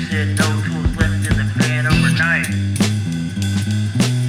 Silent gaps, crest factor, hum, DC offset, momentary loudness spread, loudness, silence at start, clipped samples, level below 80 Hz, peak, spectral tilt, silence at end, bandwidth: none; 14 dB; none; under 0.1%; 6 LU; -18 LUFS; 0 s; under 0.1%; -30 dBFS; -2 dBFS; -5 dB/octave; 0 s; 15.5 kHz